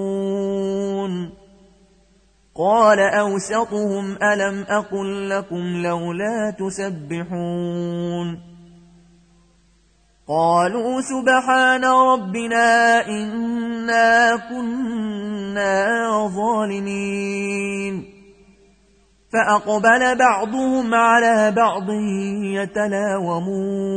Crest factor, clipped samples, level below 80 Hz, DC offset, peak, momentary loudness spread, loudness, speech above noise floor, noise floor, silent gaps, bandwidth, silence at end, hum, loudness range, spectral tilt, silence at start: 16 dB; under 0.1%; -56 dBFS; under 0.1%; -4 dBFS; 11 LU; -19 LUFS; 39 dB; -57 dBFS; none; 9.4 kHz; 0 s; none; 8 LU; -5 dB/octave; 0 s